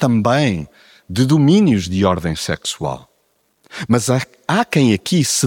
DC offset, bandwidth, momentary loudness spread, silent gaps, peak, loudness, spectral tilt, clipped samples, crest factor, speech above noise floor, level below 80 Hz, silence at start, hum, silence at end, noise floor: under 0.1%; 17.5 kHz; 13 LU; none; -2 dBFS; -16 LUFS; -5 dB/octave; under 0.1%; 16 dB; 47 dB; -46 dBFS; 0 s; none; 0 s; -63 dBFS